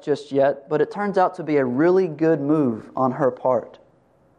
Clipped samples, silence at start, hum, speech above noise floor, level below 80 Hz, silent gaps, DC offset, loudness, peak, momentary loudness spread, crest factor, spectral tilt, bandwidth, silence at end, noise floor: under 0.1%; 0.05 s; none; 38 dB; -68 dBFS; none; under 0.1%; -21 LUFS; -6 dBFS; 5 LU; 16 dB; -8.5 dB/octave; 9.6 kHz; 0.7 s; -58 dBFS